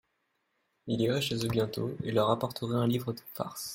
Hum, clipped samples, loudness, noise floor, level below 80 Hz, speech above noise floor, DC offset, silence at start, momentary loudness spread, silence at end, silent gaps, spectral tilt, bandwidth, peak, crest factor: none; under 0.1%; -31 LUFS; -78 dBFS; -64 dBFS; 47 dB; under 0.1%; 0.85 s; 10 LU; 0 s; none; -6 dB/octave; 16.5 kHz; -12 dBFS; 20 dB